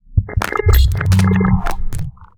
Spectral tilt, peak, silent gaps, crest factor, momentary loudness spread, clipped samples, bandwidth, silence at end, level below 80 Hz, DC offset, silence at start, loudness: -6.5 dB/octave; -2 dBFS; none; 14 dB; 13 LU; under 0.1%; over 20 kHz; 0.15 s; -18 dBFS; under 0.1%; 0.1 s; -16 LUFS